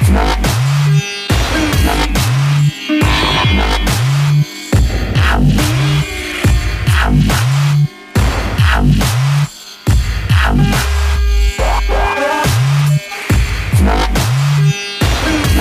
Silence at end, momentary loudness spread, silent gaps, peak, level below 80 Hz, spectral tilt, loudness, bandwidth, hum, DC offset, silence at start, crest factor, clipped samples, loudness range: 0 s; 4 LU; none; 0 dBFS; -18 dBFS; -5 dB/octave; -13 LUFS; 15.5 kHz; none; under 0.1%; 0 s; 12 dB; under 0.1%; 1 LU